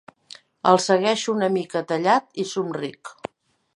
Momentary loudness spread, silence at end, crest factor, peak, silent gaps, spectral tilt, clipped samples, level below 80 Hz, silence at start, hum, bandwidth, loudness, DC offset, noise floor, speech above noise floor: 19 LU; 0.65 s; 22 dB; -2 dBFS; none; -4.5 dB/octave; under 0.1%; -72 dBFS; 0.65 s; none; 11.5 kHz; -22 LUFS; under 0.1%; -48 dBFS; 26 dB